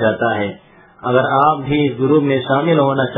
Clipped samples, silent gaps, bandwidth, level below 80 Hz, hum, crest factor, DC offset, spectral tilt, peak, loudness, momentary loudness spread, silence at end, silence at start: under 0.1%; none; 3.9 kHz; -50 dBFS; none; 16 dB; under 0.1%; -10.5 dB/octave; 0 dBFS; -15 LUFS; 6 LU; 0 s; 0 s